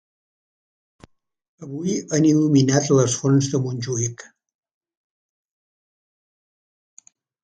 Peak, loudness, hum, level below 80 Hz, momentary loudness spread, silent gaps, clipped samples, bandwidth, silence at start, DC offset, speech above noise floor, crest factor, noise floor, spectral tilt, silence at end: -2 dBFS; -20 LUFS; none; -62 dBFS; 11 LU; none; under 0.1%; 9.4 kHz; 1.6 s; under 0.1%; 34 dB; 20 dB; -53 dBFS; -5.5 dB/octave; 3.2 s